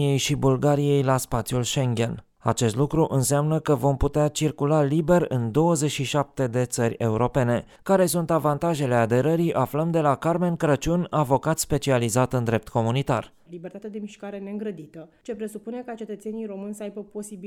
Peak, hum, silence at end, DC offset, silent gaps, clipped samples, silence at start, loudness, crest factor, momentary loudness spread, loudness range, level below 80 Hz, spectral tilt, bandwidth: -6 dBFS; none; 0 s; under 0.1%; none; under 0.1%; 0 s; -23 LUFS; 18 dB; 14 LU; 10 LU; -46 dBFS; -6 dB/octave; 17.5 kHz